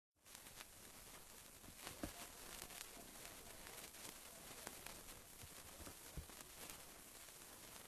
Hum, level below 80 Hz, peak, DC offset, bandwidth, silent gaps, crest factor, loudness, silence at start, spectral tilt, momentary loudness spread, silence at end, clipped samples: none; -68 dBFS; -26 dBFS; under 0.1%; 13 kHz; none; 32 dB; -55 LUFS; 0.15 s; -2 dB/octave; 6 LU; 0 s; under 0.1%